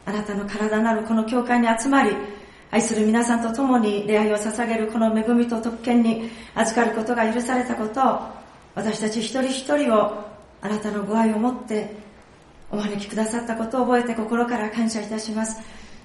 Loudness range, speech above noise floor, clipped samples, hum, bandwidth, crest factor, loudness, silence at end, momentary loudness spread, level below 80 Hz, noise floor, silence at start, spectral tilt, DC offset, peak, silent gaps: 4 LU; 27 dB; under 0.1%; none; 11.5 kHz; 16 dB; -22 LUFS; 0.05 s; 10 LU; -54 dBFS; -48 dBFS; 0.05 s; -4.5 dB/octave; under 0.1%; -6 dBFS; none